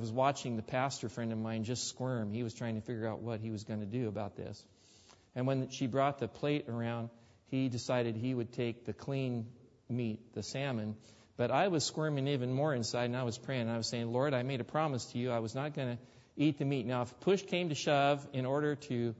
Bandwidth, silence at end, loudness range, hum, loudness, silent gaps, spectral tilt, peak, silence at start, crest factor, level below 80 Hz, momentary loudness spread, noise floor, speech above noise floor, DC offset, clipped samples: 7.6 kHz; 0 s; 5 LU; none; -36 LUFS; none; -5.5 dB/octave; -16 dBFS; 0 s; 18 dB; -72 dBFS; 9 LU; -63 dBFS; 28 dB; under 0.1%; under 0.1%